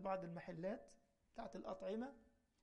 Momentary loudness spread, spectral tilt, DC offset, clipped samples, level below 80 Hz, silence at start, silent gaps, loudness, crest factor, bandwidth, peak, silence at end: 13 LU; -7 dB/octave; under 0.1%; under 0.1%; -74 dBFS; 0 s; none; -50 LUFS; 18 dB; 11 kHz; -32 dBFS; 0.35 s